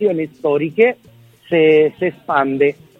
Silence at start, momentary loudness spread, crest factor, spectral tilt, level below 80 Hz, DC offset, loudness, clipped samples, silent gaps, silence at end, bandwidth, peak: 0 s; 8 LU; 16 dB; -8 dB/octave; -62 dBFS; under 0.1%; -16 LUFS; under 0.1%; none; 0.25 s; 4.1 kHz; 0 dBFS